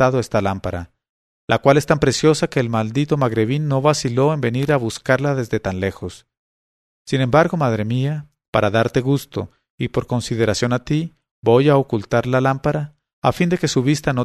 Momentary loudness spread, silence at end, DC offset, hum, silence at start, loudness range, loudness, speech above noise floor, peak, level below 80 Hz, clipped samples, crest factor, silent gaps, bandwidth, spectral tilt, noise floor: 11 LU; 0 s; under 0.1%; none; 0 s; 3 LU; -19 LUFS; over 72 dB; 0 dBFS; -46 dBFS; under 0.1%; 18 dB; 1.09-1.48 s, 6.37-7.05 s, 8.48-8.53 s, 9.70-9.78 s, 11.31-11.42 s, 13.13-13.22 s; 13.5 kHz; -6 dB/octave; under -90 dBFS